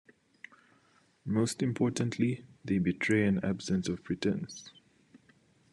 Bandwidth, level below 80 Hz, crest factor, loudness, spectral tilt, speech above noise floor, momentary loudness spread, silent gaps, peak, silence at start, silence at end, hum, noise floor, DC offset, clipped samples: 12 kHz; -66 dBFS; 18 dB; -31 LUFS; -6 dB/octave; 36 dB; 24 LU; none; -16 dBFS; 1.25 s; 1.05 s; none; -67 dBFS; under 0.1%; under 0.1%